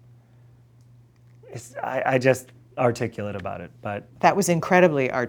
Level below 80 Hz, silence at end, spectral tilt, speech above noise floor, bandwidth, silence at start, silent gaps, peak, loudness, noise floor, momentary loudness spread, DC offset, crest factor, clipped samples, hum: -62 dBFS; 0 s; -5.5 dB/octave; 30 dB; 20 kHz; 1.45 s; none; -2 dBFS; -23 LUFS; -53 dBFS; 18 LU; under 0.1%; 22 dB; under 0.1%; none